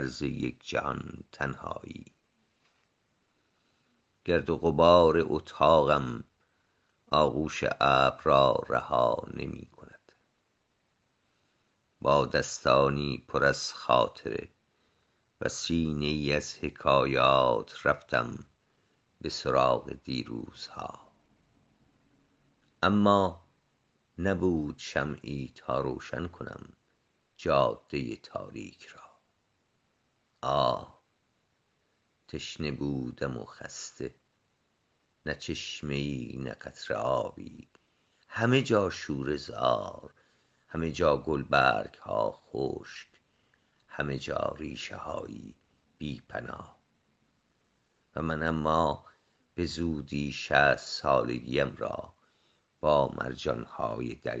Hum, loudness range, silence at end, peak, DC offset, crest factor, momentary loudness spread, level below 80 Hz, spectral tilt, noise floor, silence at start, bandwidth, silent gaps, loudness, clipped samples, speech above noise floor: none; 11 LU; 0 s; -6 dBFS; under 0.1%; 24 dB; 17 LU; -54 dBFS; -5.5 dB/octave; -75 dBFS; 0 s; 8.4 kHz; none; -29 LUFS; under 0.1%; 46 dB